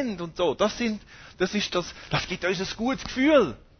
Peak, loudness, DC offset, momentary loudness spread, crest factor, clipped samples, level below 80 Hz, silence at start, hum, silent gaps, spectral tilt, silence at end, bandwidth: -8 dBFS; -26 LUFS; under 0.1%; 9 LU; 18 dB; under 0.1%; -50 dBFS; 0 s; none; none; -4.5 dB/octave; 0.2 s; 6.6 kHz